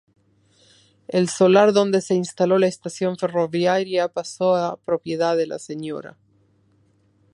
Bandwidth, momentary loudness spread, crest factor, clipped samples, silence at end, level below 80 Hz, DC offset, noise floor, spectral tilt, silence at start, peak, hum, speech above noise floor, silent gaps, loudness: 11.5 kHz; 12 LU; 20 dB; under 0.1%; 1.25 s; -70 dBFS; under 0.1%; -61 dBFS; -5.5 dB/octave; 1.1 s; -2 dBFS; none; 41 dB; none; -21 LUFS